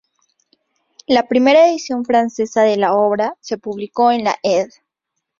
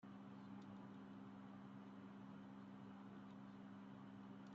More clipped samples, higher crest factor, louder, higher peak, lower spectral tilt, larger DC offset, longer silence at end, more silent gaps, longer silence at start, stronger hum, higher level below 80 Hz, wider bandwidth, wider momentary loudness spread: neither; first, 16 dB vs 10 dB; first, -16 LUFS vs -59 LUFS; first, 0 dBFS vs -46 dBFS; second, -4.5 dB/octave vs -6.5 dB/octave; neither; first, 0.75 s vs 0 s; neither; first, 1.1 s vs 0 s; neither; first, -62 dBFS vs -90 dBFS; about the same, 7.6 kHz vs 7.4 kHz; first, 13 LU vs 1 LU